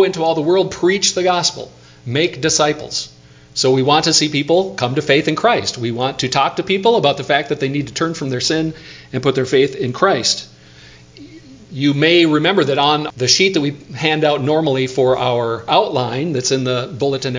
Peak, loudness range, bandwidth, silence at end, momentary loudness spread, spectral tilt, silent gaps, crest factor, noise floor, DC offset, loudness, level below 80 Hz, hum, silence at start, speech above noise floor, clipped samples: 0 dBFS; 3 LU; 7.8 kHz; 0 s; 8 LU; -4 dB/octave; none; 16 dB; -42 dBFS; under 0.1%; -16 LUFS; -52 dBFS; none; 0 s; 26 dB; under 0.1%